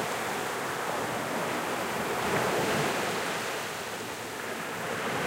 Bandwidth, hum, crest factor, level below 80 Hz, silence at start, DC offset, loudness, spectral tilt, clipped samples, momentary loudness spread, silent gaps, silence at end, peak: 16 kHz; none; 14 dB; -62 dBFS; 0 s; under 0.1%; -31 LUFS; -3 dB/octave; under 0.1%; 7 LU; none; 0 s; -16 dBFS